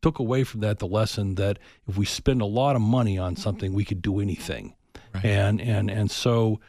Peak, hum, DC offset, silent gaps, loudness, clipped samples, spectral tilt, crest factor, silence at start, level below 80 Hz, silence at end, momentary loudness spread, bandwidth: -6 dBFS; none; under 0.1%; none; -25 LUFS; under 0.1%; -6.5 dB/octave; 18 dB; 0.05 s; -44 dBFS; 0.1 s; 9 LU; 13 kHz